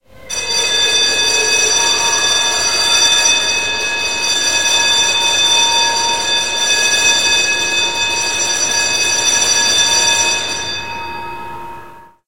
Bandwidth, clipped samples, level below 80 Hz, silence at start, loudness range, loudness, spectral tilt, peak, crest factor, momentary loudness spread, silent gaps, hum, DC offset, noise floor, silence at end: 16 kHz; under 0.1%; -48 dBFS; 0 s; 2 LU; -11 LUFS; 1 dB/octave; 0 dBFS; 14 dB; 11 LU; none; none; 2%; -37 dBFS; 0 s